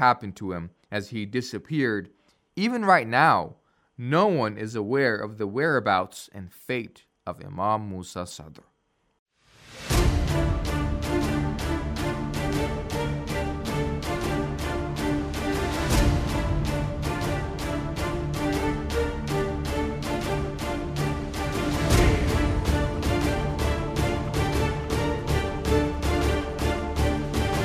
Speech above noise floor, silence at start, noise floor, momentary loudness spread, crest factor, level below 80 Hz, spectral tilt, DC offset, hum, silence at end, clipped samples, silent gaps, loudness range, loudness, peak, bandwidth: 26 dB; 0 s; -51 dBFS; 10 LU; 22 dB; -34 dBFS; -5.5 dB/octave; under 0.1%; none; 0 s; under 0.1%; 9.19-9.26 s; 5 LU; -26 LUFS; -4 dBFS; 15.5 kHz